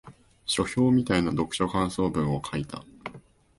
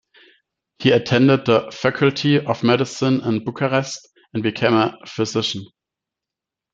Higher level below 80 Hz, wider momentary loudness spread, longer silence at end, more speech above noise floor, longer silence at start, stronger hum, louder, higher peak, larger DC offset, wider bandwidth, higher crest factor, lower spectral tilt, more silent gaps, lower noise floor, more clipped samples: first, -48 dBFS vs -60 dBFS; first, 17 LU vs 10 LU; second, 0.4 s vs 1.1 s; second, 25 dB vs 68 dB; second, 0.05 s vs 0.8 s; neither; second, -26 LUFS vs -19 LUFS; second, -12 dBFS vs -2 dBFS; neither; first, 11.5 kHz vs 7.8 kHz; about the same, 16 dB vs 18 dB; about the same, -5.5 dB/octave vs -5.5 dB/octave; neither; second, -50 dBFS vs -86 dBFS; neither